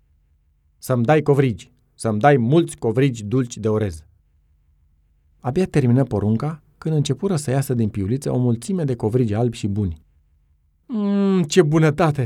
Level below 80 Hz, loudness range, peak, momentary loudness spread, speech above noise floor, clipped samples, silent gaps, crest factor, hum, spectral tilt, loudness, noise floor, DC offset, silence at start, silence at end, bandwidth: -48 dBFS; 4 LU; 0 dBFS; 11 LU; 42 dB; under 0.1%; none; 20 dB; none; -7 dB/octave; -20 LUFS; -61 dBFS; under 0.1%; 0.85 s; 0 s; 15 kHz